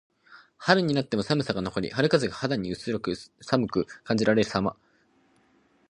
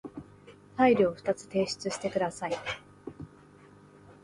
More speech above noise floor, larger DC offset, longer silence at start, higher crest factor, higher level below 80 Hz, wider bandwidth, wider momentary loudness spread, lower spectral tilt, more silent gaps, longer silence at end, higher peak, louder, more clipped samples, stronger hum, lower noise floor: first, 38 dB vs 27 dB; neither; first, 0.3 s vs 0.05 s; first, 26 dB vs 20 dB; first, -58 dBFS vs -64 dBFS; about the same, 11 kHz vs 11.5 kHz; second, 8 LU vs 24 LU; about the same, -6 dB/octave vs -5 dB/octave; neither; first, 1.2 s vs 0.1 s; first, -2 dBFS vs -12 dBFS; first, -26 LUFS vs -29 LUFS; neither; second, none vs 50 Hz at -55 dBFS; first, -64 dBFS vs -55 dBFS